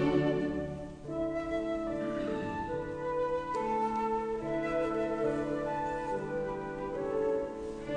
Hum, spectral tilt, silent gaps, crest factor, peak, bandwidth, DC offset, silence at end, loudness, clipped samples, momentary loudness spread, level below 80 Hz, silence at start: none; -7 dB/octave; none; 16 dB; -16 dBFS; 10 kHz; under 0.1%; 0 s; -34 LUFS; under 0.1%; 6 LU; -52 dBFS; 0 s